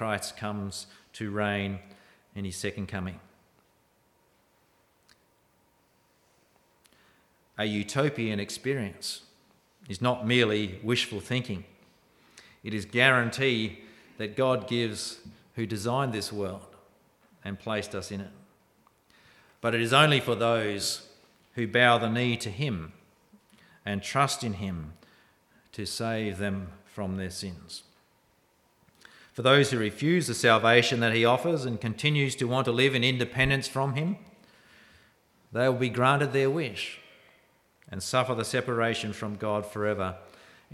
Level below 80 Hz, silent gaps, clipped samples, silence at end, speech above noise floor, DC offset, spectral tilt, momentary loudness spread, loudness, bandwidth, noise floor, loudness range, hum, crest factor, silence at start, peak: -60 dBFS; none; under 0.1%; 0.5 s; 40 dB; under 0.1%; -4.5 dB/octave; 18 LU; -27 LUFS; 15.5 kHz; -67 dBFS; 11 LU; none; 24 dB; 0 s; -4 dBFS